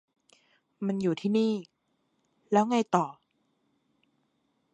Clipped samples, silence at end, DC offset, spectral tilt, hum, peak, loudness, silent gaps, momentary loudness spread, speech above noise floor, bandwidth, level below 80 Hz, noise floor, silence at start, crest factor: under 0.1%; 1.6 s; under 0.1%; -6.5 dB/octave; none; -8 dBFS; -28 LUFS; none; 11 LU; 48 dB; 9 kHz; -78 dBFS; -75 dBFS; 0.8 s; 22 dB